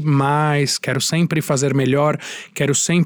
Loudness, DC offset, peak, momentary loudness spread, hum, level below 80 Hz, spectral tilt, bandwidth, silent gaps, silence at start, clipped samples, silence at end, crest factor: -18 LUFS; under 0.1%; -6 dBFS; 5 LU; none; -60 dBFS; -4.5 dB/octave; over 20 kHz; none; 0 s; under 0.1%; 0 s; 12 dB